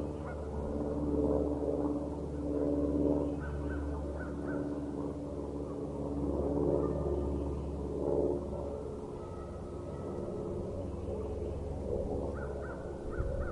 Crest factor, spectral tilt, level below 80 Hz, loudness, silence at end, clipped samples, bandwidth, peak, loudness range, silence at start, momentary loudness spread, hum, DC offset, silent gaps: 18 dB; -9 dB/octave; -44 dBFS; -36 LUFS; 0 s; under 0.1%; 11 kHz; -18 dBFS; 5 LU; 0 s; 9 LU; none; under 0.1%; none